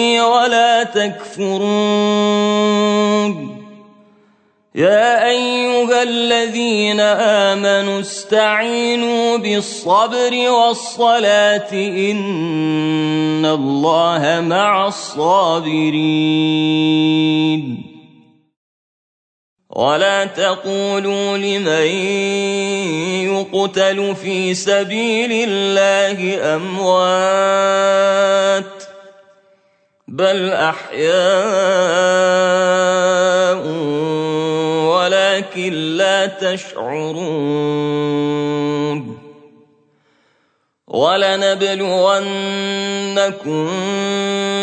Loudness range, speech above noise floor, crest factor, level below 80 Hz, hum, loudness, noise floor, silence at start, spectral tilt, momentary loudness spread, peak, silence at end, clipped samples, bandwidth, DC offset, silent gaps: 5 LU; 48 dB; 14 dB; -68 dBFS; none; -15 LUFS; -64 dBFS; 0 s; -4 dB/octave; 7 LU; -2 dBFS; 0 s; under 0.1%; 9.2 kHz; under 0.1%; 18.56-19.56 s